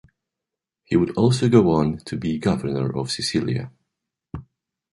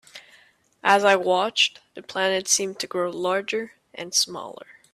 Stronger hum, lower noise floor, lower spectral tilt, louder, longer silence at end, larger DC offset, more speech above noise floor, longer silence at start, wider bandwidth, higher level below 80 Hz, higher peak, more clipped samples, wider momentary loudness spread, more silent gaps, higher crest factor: neither; first, -86 dBFS vs -57 dBFS; first, -6.5 dB/octave vs -1.5 dB/octave; about the same, -21 LUFS vs -22 LUFS; first, 0.5 s vs 0.3 s; neither; first, 66 dB vs 34 dB; first, 0.9 s vs 0.15 s; second, 11.5 kHz vs 15.5 kHz; first, -48 dBFS vs -74 dBFS; about the same, -4 dBFS vs -4 dBFS; neither; first, 22 LU vs 18 LU; neither; about the same, 20 dB vs 22 dB